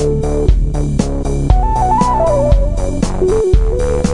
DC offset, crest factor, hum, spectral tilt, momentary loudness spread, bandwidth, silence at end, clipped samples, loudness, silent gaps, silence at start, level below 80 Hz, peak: under 0.1%; 12 dB; none; -7.5 dB/octave; 5 LU; 11 kHz; 0 s; under 0.1%; -15 LUFS; none; 0 s; -16 dBFS; 0 dBFS